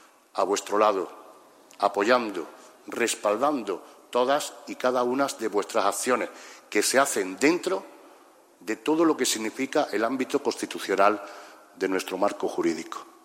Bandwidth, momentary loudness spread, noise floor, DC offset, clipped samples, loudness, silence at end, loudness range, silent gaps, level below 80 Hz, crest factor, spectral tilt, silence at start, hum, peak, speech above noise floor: 16 kHz; 13 LU; -55 dBFS; under 0.1%; under 0.1%; -26 LUFS; 0.15 s; 2 LU; none; -82 dBFS; 22 dB; -2.5 dB/octave; 0.35 s; none; -6 dBFS; 29 dB